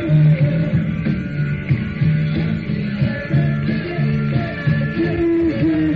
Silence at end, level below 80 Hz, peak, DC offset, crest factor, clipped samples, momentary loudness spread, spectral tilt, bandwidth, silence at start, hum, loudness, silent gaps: 0 s; -38 dBFS; -6 dBFS; under 0.1%; 12 dB; under 0.1%; 5 LU; -8 dB/octave; 5 kHz; 0 s; none; -19 LUFS; none